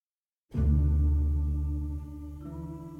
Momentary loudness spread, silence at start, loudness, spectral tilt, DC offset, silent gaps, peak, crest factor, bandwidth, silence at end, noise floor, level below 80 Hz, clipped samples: 15 LU; 0.5 s; -29 LUFS; -10.5 dB/octave; under 0.1%; none; -14 dBFS; 14 dB; 1.6 kHz; 0 s; -89 dBFS; -30 dBFS; under 0.1%